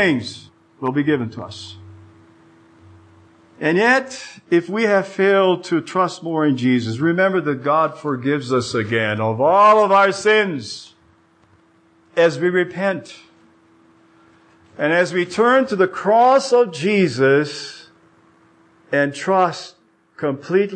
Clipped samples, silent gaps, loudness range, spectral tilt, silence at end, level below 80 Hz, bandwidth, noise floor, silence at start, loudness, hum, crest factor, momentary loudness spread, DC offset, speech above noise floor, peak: under 0.1%; none; 7 LU; -5.5 dB/octave; 0 s; -68 dBFS; 9.6 kHz; -55 dBFS; 0 s; -17 LUFS; none; 16 dB; 15 LU; under 0.1%; 38 dB; -4 dBFS